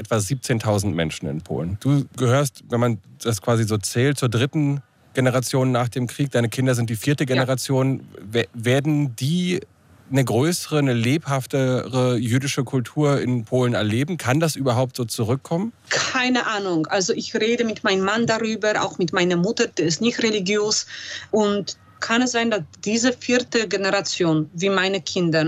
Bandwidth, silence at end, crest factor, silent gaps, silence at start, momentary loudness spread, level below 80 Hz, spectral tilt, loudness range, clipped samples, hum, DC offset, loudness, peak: 16 kHz; 0 s; 16 dB; none; 0 s; 5 LU; -64 dBFS; -5 dB/octave; 1 LU; under 0.1%; none; under 0.1%; -21 LUFS; -4 dBFS